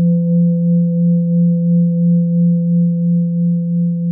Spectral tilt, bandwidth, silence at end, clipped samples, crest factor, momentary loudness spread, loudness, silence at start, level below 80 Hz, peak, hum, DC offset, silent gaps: -18.5 dB/octave; 0.5 kHz; 0 s; under 0.1%; 6 dB; 3 LU; -14 LUFS; 0 s; -76 dBFS; -6 dBFS; none; under 0.1%; none